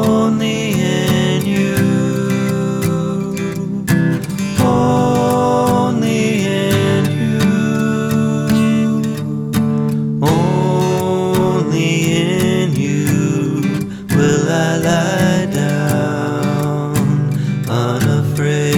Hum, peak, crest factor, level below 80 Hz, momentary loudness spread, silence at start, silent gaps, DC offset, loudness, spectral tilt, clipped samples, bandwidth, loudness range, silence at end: none; -2 dBFS; 12 dB; -44 dBFS; 4 LU; 0 s; none; under 0.1%; -15 LUFS; -6 dB/octave; under 0.1%; 18.5 kHz; 2 LU; 0 s